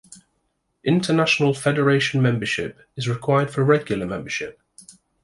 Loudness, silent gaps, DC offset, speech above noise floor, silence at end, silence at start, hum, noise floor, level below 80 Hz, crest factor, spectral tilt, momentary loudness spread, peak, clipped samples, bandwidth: -21 LUFS; none; under 0.1%; 51 dB; 0.45 s; 0.1 s; none; -72 dBFS; -56 dBFS; 18 dB; -5.5 dB/octave; 10 LU; -4 dBFS; under 0.1%; 11.5 kHz